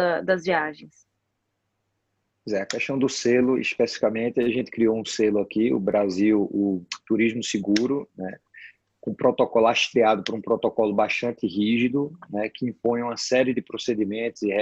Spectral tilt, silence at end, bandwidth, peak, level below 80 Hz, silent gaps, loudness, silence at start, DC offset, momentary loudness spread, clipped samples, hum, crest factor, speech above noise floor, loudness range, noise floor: -5 dB/octave; 0 s; 8.4 kHz; -6 dBFS; -64 dBFS; none; -24 LUFS; 0 s; under 0.1%; 9 LU; under 0.1%; none; 18 dB; 53 dB; 3 LU; -77 dBFS